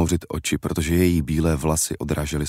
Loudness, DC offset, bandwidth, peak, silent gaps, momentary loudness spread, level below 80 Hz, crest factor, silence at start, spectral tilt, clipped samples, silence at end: -22 LUFS; under 0.1%; 16 kHz; -8 dBFS; none; 5 LU; -34 dBFS; 14 dB; 0 s; -5 dB/octave; under 0.1%; 0 s